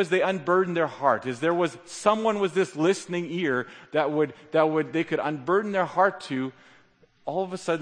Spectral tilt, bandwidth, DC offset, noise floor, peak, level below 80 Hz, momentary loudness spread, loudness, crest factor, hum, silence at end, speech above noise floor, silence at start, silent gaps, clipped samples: -5.5 dB/octave; 9.8 kHz; under 0.1%; -59 dBFS; -6 dBFS; -74 dBFS; 7 LU; -26 LUFS; 20 dB; none; 0 s; 34 dB; 0 s; none; under 0.1%